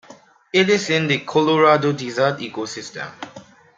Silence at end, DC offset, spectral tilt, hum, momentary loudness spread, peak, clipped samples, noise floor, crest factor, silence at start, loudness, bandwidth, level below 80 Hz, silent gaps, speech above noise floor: 0.35 s; under 0.1%; -5 dB/octave; none; 17 LU; -2 dBFS; under 0.1%; -47 dBFS; 18 dB; 0.1 s; -18 LUFS; 9 kHz; -66 dBFS; none; 28 dB